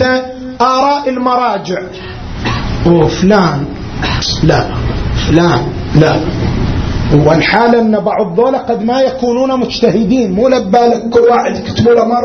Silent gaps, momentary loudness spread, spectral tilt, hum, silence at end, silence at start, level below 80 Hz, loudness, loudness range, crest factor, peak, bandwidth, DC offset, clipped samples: none; 8 LU; -6.5 dB/octave; none; 0 s; 0 s; -26 dBFS; -11 LUFS; 2 LU; 10 dB; 0 dBFS; 6.6 kHz; under 0.1%; 0.2%